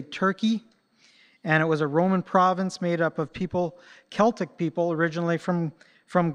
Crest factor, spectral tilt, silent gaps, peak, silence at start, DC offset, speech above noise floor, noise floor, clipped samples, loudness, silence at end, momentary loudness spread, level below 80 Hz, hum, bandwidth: 20 dB; -7 dB/octave; none; -6 dBFS; 0 s; under 0.1%; 36 dB; -61 dBFS; under 0.1%; -25 LUFS; 0 s; 9 LU; -64 dBFS; none; 10 kHz